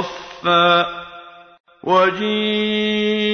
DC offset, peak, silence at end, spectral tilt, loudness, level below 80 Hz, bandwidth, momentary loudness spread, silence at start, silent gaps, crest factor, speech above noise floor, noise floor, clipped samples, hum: under 0.1%; -2 dBFS; 0 s; -5.5 dB/octave; -17 LUFS; -58 dBFS; 6.6 kHz; 16 LU; 0 s; 1.60-1.64 s; 16 dB; 23 dB; -40 dBFS; under 0.1%; none